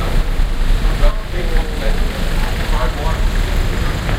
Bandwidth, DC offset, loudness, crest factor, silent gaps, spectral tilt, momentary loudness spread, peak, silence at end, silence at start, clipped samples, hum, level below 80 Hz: 15 kHz; under 0.1%; -20 LUFS; 14 dB; none; -5.5 dB/octave; 2 LU; 0 dBFS; 0 s; 0 s; under 0.1%; none; -16 dBFS